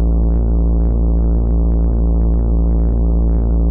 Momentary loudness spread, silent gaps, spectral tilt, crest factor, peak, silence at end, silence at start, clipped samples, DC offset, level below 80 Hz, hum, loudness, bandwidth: 0 LU; none; -13.5 dB/octave; 2 dB; -10 dBFS; 0 s; 0 s; under 0.1%; under 0.1%; -14 dBFS; none; -16 LUFS; 1.4 kHz